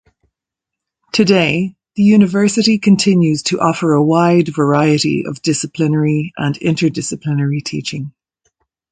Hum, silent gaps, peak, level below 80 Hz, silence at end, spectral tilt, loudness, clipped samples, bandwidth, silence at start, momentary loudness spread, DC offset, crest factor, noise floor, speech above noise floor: none; none; 0 dBFS; -54 dBFS; 0.8 s; -5.5 dB/octave; -14 LUFS; under 0.1%; 9.4 kHz; 1.15 s; 9 LU; under 0.1%; 14 dB; -83 dBFS; 69 dB